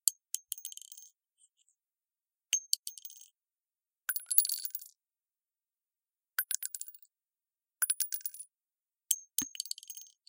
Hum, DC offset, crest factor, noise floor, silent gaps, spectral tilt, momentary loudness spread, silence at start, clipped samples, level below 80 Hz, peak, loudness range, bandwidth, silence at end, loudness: none; under 0.1%; 38 dB; under -90 dBFS; 2.79-2.83 s; 3 dB/octave; 21 LU; 0.05 s; under 0.1%; -84 dBFS; -2 dBFS; 6 LU; 17 kHz; 0.25 s; -33 LUFS